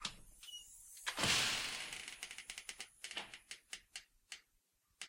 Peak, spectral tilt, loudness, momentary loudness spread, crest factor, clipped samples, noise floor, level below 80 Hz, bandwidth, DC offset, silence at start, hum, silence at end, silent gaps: -20 dBFS; -0.5 dB/octave; -41 LUFS; 21 LU; 24 dB; under 0.1%; -79 dBFS; -70 dBFS; 16 kHz; under 0.1%; 0 s; none; 0 s; none